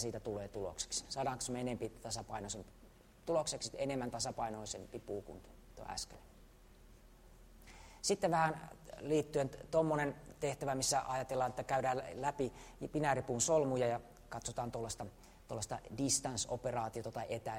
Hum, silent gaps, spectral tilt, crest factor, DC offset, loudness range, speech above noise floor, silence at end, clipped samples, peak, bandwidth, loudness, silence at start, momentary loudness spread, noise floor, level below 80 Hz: none; none; -4 dB/octave; 20 dB; under 0.1%; 7 LU; 22 dB; 0 s; under 0.1%; -20 dBFS; 16 kHz; -39 LUFS; 0 s; 14 LU; -61 dBFS; -60 dBFS